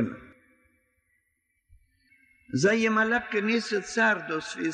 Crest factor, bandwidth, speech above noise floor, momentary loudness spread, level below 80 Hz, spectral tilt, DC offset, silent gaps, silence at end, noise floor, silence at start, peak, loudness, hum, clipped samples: 18 dB; 9.6 kHz; 50 dB; 10 LU; -66 dBFS; -4.5 dB/octave; under 0.1%; none; 0 s; -76 dBFS; 0 s; -12 dBFS; -26 LUFS; none; under 0.1%